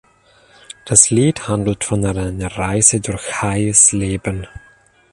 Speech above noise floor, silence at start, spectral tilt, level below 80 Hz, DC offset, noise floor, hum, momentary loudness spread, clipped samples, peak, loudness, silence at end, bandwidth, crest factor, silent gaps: 35 dB; 0.85 s; -4 dB/octave; -38 dBFS; under 0.1%; -51 dBFS; none; 14 LU; under 0.1%; 0 dBFS; -15 LUFS; 0.55 s; 12.5 kHz; 18 dB; none